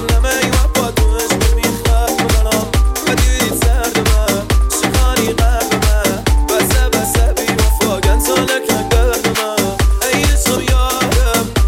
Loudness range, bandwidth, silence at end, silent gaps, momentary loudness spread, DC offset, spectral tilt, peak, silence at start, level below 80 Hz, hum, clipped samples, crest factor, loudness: 0 LU; 17 kHz; 0 s; none; 2 LU; under 0.1%; -4 dB/octave; 0 dBFS; 0 s; -16 dBFS; none; under 0.1%; 12 dB; -14 LUFS